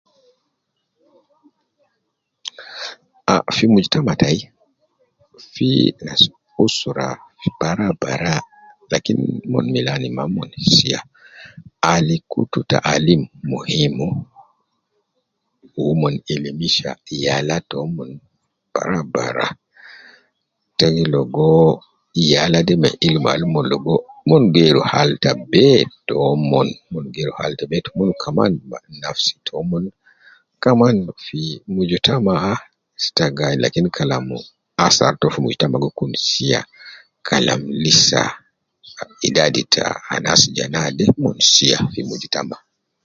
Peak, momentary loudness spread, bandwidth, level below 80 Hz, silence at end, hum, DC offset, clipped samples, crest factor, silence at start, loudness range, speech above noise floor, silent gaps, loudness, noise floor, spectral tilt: 0 dBFS; 13 LU; 7.8 kHz; -48 dBFS; 0.5 s; none; under 0.1%; under 0.1%; 18 dB; 2.45 s; 7 LU; 57 dB; none; -17 LUFS; -74 dBFS; -4.5 dB/octave